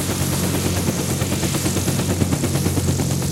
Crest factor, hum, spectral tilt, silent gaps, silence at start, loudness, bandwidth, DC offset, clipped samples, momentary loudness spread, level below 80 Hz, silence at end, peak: 18 dB; none; -4.5 dB/octave; none; 0 s; -20 LUFS; 16 kHz; under 0.1%; under 0.1%; 1 LU; -38 dBFS; 0 s; -4 dBFS